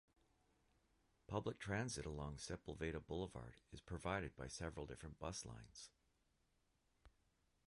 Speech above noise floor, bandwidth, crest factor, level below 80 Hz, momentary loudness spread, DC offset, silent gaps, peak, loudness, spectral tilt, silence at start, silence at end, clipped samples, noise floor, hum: 34 dB; 11 kHz; 22 dB; -62 dBFS; 12 LU; under 0.1%; none; -28 dBFS; -49 LUFS; -5 dB/octave; 1.3 s; 0.6 s; under 0.1%; -83 dBFS; none